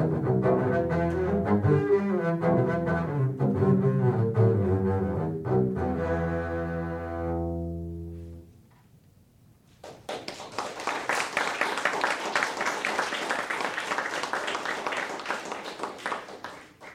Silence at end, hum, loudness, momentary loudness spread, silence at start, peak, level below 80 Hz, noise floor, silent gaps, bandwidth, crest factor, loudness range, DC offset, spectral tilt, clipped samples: 0 s; none; -28 LUFS; 13 LU; 0 s; -8 dBFS; -54 dBFS; -58 dBFS; none; 14.5 kHz; 20 dB; 11 LU; under 0.1%; -6 dB/octave; under 0.1%